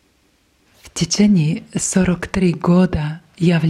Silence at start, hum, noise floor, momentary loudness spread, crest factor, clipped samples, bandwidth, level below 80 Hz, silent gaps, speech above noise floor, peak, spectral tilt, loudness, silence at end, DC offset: 0.85 s; none; -59 dBFS; 10 LU; 16 dB; under 0.1%; 12 kHz; -40 dBFS; none; 43 dB; -2 dBFS; -5.5 dB/octave; -17 LUFS; 0 s; under 0.1%